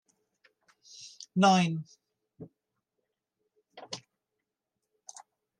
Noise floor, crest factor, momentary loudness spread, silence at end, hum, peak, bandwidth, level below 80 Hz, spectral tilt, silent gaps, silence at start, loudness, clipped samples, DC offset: -86 dBFS; 24 dB; 28 LU; 1.6 s; none; -10 dBFS; 10 kHz; -80 dBFS; -5 dB/octave; none; 1 s; -27 LUFS; under 0.1%; under 0.1%